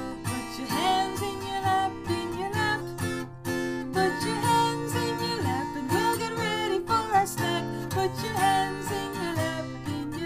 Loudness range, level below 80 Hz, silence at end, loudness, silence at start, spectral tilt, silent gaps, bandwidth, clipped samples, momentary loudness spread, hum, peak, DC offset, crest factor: 2 LU; -52 dBFS; 0 s; -28 LUFS; 0 s; -4.5 dB/octave; none; 15.5 kHz; under 0.1%; 8 LU; none; -12 dBFS; under 0.1%; 16 dB